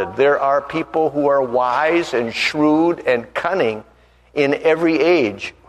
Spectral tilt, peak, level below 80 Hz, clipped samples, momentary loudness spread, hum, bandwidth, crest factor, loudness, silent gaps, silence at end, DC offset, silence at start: -5.5 dB/octave; -2 dBFS; -54 dBFS; under 0.1%; 6 LU; none; 11.5 kHz; 16 dB; -17 LUFS; none; 0.2 s; under 0.1%; 0 s